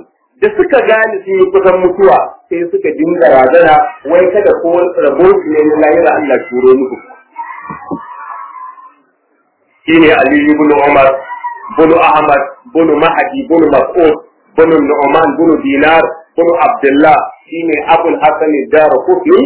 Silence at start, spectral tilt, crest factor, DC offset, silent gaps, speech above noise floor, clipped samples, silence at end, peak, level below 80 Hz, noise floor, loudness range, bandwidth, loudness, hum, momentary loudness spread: 0.4 s; -9.5 dB/octave; 8 dB; under 0.1%; none; 48 dB; 1%; 0 s; 0 dBFS; -44 dBFS; -56 dBFS; 5 LU; 4 kHz; -9 LUFS; none; 16 LU